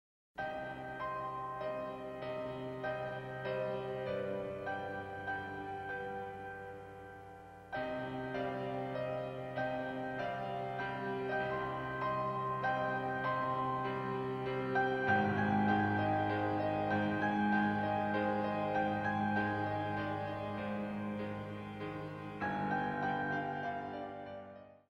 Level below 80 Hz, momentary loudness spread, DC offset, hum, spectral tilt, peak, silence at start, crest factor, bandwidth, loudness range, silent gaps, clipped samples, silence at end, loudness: -66 dBFS; 11 LU; under 0.1%; none; -7.5 dB/octave; -20 dBFS; 0.35 s; 18 dB; 9.8 kHz; 8 LU; none; under 0.1%; 0.15 s; -37 LUFS